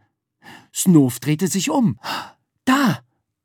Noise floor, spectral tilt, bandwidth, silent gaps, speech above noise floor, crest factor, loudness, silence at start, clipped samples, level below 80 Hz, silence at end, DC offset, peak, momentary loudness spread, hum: -50 dBFS; -5 dB/octave; 19.5 kHz; none; 32 dB; 18 dB; -19 LUFS; 0.5 s; under 0.1%; -70 dBFS; 0.45 s; under 0.1%; -2 dBFS; 14 LU; none